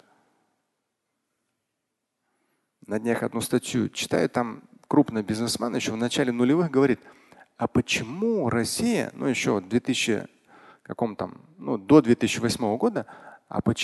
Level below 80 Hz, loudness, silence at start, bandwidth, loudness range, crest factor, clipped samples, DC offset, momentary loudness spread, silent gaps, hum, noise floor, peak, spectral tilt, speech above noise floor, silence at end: -56 dBFS; -25 LUFS; 2.9 s; 12.5 kHz; 6 LU; 22 dB; under 0.1%; under 0.1%; 11 LU; none; none; -81 dBFS; -4 dBFS; -5 dB/octave; 57 dB; 0 s